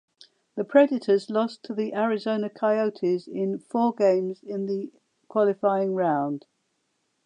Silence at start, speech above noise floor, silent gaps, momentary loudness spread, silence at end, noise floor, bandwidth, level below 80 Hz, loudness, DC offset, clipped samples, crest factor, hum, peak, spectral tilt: 0.55 s; 50 dB; none; 10 LU; 0.9 s; -74 dBFS; 9.8 kHz; -84 dBFS; -25 LUFS; under 0.1%; under 0.1%; 20 dB; none; -6 dBFS; -7.5 dB/octave